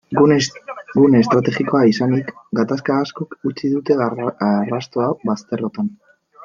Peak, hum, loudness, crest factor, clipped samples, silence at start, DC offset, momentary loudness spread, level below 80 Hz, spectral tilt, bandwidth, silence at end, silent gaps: 0 dBFS; none; -18 LUFS; 16 dB; under 0.1%; 0.1 s; under 0.1%; 11 LU; -60 dBFS; -6.5 dB/octave; 7.6 kHz; 0 s; none